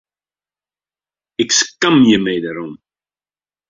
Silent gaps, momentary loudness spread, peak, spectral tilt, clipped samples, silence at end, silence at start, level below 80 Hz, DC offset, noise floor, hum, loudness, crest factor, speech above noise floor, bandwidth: none; 18 LU; 0 dBFS; -3 dB/octave; under 0.1%; 0.95 s; 1.4 s; -58 dBFS; under 0.1%; under -90 dBFS; 50 Hz at -50 dBFS; -14 LUFS; 18 dB; over 76 dB; 7.8 kHz